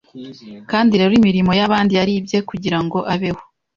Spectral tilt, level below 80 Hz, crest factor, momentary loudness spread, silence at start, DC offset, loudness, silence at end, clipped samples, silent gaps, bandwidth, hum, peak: -6.5 dB/octave; -48 dBFS; 14 dB; 21 LU; 0.15 s; under 0.1%; -16 LUFS; 0.35 s; under 0.1%; none; 7.2 kHz; none; -2 dBFS